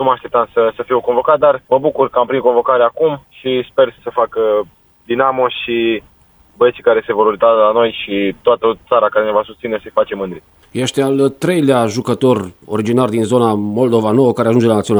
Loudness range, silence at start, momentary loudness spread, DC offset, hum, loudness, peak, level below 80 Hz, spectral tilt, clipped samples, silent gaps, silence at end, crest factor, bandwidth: 3 LU; 0 s; 7 LU; under 0.1%; none; -14 LUFS; 0 dBFS; -52 dBFS; -6 dB/octave; under 0.1%; none; 0 s; 14 dB; over 20 kHz